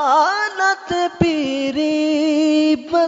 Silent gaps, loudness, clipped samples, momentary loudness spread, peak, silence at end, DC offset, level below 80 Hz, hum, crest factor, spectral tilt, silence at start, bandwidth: none; -17 LUFS; under 0.1%; 5 LU; 0 dBFS; 0 s; under 0.1%; -50 dBFS; none; 16 dB; -5 dB/octave; 0 s; 7.8 kHz